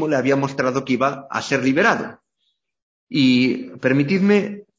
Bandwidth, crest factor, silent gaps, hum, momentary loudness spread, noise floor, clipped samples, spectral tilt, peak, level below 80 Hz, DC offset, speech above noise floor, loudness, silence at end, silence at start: 7.8 kHz; 18 dB; 2.82-3.07 s; none; 7 LU; -72 dBFS; under 0.1%; -6 dB/octave; -2 dBFS; -62 dBFS; under 0.1%; 53 dB; -19 LUFS; 0.15 s; 0 s